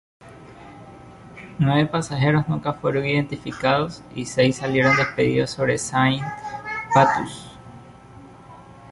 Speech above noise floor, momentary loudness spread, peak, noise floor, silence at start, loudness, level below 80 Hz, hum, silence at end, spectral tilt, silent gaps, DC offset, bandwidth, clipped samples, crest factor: 23 dB; 21 LU; -2 dBFS; -44 dBFS; 0.25 s; -21 LUFS; -52 dBFS; none; 0 s; -5.5 dB/octave; none; under 0.1%; 11.5 kHz; under 0.1%; 22 dB